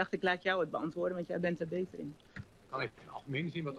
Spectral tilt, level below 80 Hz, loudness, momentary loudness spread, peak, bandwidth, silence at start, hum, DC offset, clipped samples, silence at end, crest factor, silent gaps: -7 dB/octave; -70 dBFS; -37 LUFS; 16 LU; -18 dBFS; 11 kHz; 0 s; none; under 0.1%; under 0.1%; 0 s; 20 dB; none